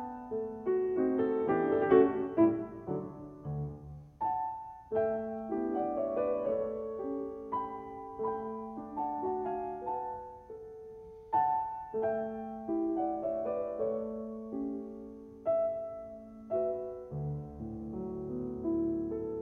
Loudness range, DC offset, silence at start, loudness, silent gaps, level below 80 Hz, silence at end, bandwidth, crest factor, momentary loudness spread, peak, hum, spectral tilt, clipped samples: 7 LU; under 0.1%; 0 s; -34 LUFS; none; -62 dBFS; 0 s; 3.7 kHz; 22 dB; 15 LU; -12 dBFS; none; -10.5 dB/octave; under 0.1%